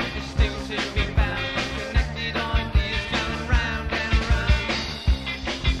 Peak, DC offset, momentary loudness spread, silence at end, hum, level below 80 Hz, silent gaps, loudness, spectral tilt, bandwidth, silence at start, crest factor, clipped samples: -6 dBFS; under 0.1%; 4 LU; 0 s; none; -26 dBFS; none; -25 LUFS; -5 dB/octave; 10.5 kHz; 0 s; 16 dB; under 0.1%